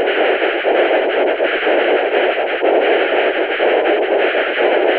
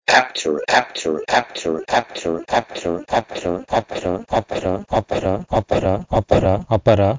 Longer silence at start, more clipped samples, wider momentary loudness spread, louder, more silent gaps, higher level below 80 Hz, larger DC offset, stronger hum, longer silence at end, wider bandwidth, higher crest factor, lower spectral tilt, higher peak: about the same, 0 s vs 0.1 s; neither; second, 2 LU vs 8 LU; first, -15 LUFS vs -20 LUFS; neither; second, -58 dBFS vs -38 dBFS; neither; neither; about the same, 0 s vs 0 s; second, 5 kHz vs 7.8 kHz; second, 12 dB vs 20 dB; about the same, -5.5 dB/octave vs -5 dB/octave; about the same, -2 dBFS vs 0 dBFS